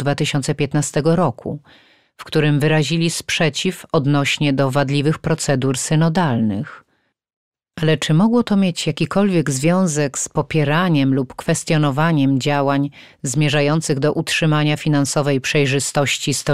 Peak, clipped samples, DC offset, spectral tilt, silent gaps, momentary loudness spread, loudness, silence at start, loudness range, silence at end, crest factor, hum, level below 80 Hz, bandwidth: -4 dBFS; under 0.1%; 0.6%; -5 dB/octave; 7.36-7.52 s; 5 LU; -18 LUFS; 0 s; 2 LU; 0 s; 14 dB; none; -50 dBFS; 14 kHz